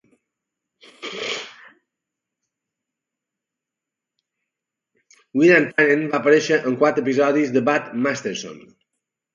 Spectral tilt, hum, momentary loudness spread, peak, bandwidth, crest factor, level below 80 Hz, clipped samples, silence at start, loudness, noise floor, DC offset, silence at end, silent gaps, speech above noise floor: -5 dB/octave; none; 16 LU; -2 dBFS; 7.6 kHz; 20 dB; -72 dBFS; under 0.1%; 1 s; -19 LUFS; -86 dBFS; under 0.1%; 0.75 s; none; 67 dB